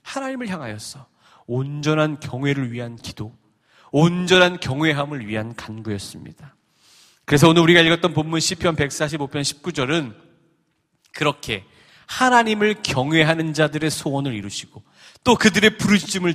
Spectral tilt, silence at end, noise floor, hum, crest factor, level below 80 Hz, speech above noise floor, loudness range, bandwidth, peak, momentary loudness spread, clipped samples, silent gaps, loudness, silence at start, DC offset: -4.5 dB/octave; 0 s; -68 dBFS; none; 20 dB; -52 dBFS; 48 dB; 7 LU; 15 kHz; 0 dBFS; 17 LU; under 0.1%; none; -19 LUFS; 0.05 s; under 0.1%